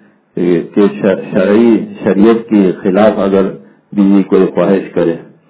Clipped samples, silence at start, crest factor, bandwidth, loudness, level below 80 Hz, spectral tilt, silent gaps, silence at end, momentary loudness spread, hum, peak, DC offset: 0.7%; 0.35 s; 10 dB; 4 kHz; -11 LUFS; -48 dBFS; -12 dB/octave; none; 0.3 s; 6 LU; none; 0 dBFS; under 0.1%